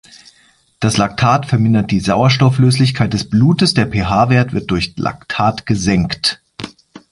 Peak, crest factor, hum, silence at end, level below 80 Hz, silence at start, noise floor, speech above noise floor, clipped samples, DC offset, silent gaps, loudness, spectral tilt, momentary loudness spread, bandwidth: 0 dBFS; 14 dB; none; 0.15 s; -38 dBFS; 0.8 s; -53 dBFS; 39 dB; under 0.1%; under 0.1%; none; -14 LUFS; -5.5 dB/octave; 8 LU; 11.5 kHz